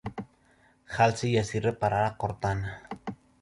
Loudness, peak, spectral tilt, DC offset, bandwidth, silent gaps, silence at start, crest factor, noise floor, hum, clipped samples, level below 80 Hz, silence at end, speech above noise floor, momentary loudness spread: -28 LUFS; -10 dBFS; -6 dB/octave; under 0.1%; 11.5 kHz; none; 0.05 s; 20 dB; -63 dBFS; none; under 0.1%; -52 dBFS; 0.25 s; 36 dB; 16 LU